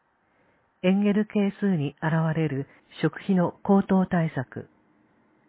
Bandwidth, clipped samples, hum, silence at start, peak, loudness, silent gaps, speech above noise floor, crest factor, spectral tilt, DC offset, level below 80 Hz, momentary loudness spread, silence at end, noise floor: 4 kHz; under 0.1%; none; 0.85 s; -10 dBFS; -25 LUFS; none; 42 dB; 16 dB; -12 dB/octave; under 0.1%; -60 dBFS; 12 LU; 0.85 s; -66 dBFS